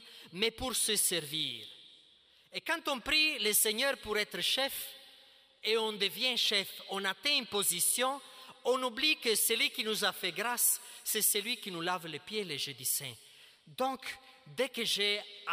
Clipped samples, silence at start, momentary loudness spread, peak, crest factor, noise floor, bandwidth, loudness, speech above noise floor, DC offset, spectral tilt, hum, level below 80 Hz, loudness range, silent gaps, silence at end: under 0.1%; 0 s; 13 LU; -16 dBFS; 18 dB; -64 dBFS; 16 kHz; -31 LUFS; 31 dB; under 0.1%; -0.5 dB/octave; none; -68 dBFS; 5 LU; none; 0 s